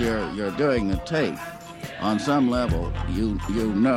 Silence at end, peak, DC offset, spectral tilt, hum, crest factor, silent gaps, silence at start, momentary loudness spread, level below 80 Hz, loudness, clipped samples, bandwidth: 0 s; -10 dBFS; under 0.1%; -6.5 dB/octave; none; 14 dB; none; 0 s; 11 LU; -36 dBFS; -24 LUFS; under 0.1%; 16 kHz